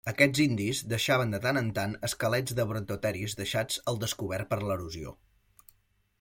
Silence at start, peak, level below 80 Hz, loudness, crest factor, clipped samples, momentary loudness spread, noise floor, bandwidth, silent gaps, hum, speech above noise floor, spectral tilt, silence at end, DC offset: 0.05 s; -8 dBFS; -58 dBFS; -30 LUFS; 24 dB; under 0.1%; 8 LU; -70 dBFS; 16.5 kHz; none; none; 40 dB; -4.5 dB/octave; 1.1 s; under 0.1%